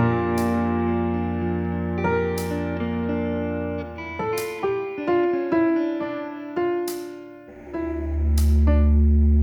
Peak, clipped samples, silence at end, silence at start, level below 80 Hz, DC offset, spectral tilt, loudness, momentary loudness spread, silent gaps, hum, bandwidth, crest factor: -8 dBFS; under 0.1%; 0 s; 0 s; -28 dBFS; under 0.1%; -8 dB/octave; -24 LUFS; 12 LU; none; none; 18 kHz; 14 dB